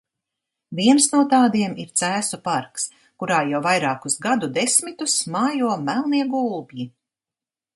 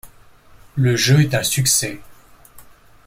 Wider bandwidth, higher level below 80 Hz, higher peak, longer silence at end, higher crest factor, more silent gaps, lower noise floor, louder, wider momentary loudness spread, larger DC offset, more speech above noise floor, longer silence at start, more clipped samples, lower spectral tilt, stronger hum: second, 12 kHz vs 16.5 kHz; second, -70 dBFS vs -48 dBFS; about the same, -2 dBFS vs -4 dBFS; first, 0.9 s vs 0.45 s; about the same, 20 dB vs 18 dB; neither; first, -90 dBFS vs -47 dBFS; second, -20 LUFS vs -16 LUFS; about the same, 13 LU vs 14 LU; neither; first, 69 dB vs 30 dB; first, 0.7 s vs 0.05 s; neither; about the same, -3 dB/octave vs -4 dB/octave; neither